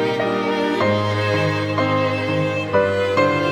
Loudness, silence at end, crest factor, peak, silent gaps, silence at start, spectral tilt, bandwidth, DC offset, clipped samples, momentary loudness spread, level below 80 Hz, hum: -19 LUFS; 0 s; 16 dB; -4 dBFS; none; 0 s; -6.5 dB/octave; 12.5 kHz; under 0.1%; under 0.1%; 3 LU; -58 dBFS; none